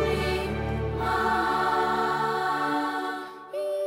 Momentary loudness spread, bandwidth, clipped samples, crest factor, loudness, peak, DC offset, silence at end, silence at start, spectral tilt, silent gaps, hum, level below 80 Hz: 8 LU; 16.5 kHz; under 0.1%; 14 dB; -27 LUFS; -12 dBFS; under 0.1%; 0 s; 0 s; -5.5 dB/octave; none; none; -42 dBFS